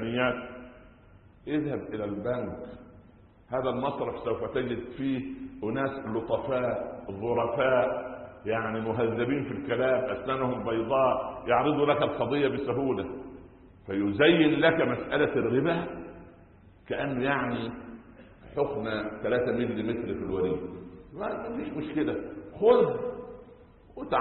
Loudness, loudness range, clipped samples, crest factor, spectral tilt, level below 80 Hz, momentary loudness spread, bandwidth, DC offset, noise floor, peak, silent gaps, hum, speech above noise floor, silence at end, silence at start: -29 LUFS; 7 LU; under 0.1%; 20 dB; -10.5 dB/octave; -56 dBFS; 18 LU; 4.3 kHz; under 0.1%; -55 dBFS; -10 dBFS; none; none; 28 dB; 0 s; 0 s